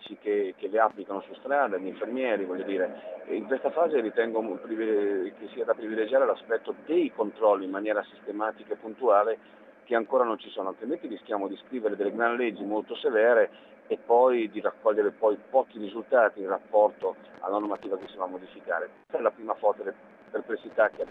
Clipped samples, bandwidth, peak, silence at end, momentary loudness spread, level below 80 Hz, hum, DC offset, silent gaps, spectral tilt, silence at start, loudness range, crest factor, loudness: under 0.1%; 4 kHz; -8 dBFS; 0 s; 11 LU; -82 dBFS; none; under 0.1%; none; -7 dB/octave; 0 s; 4 LU; 20 dB; -28 LUFS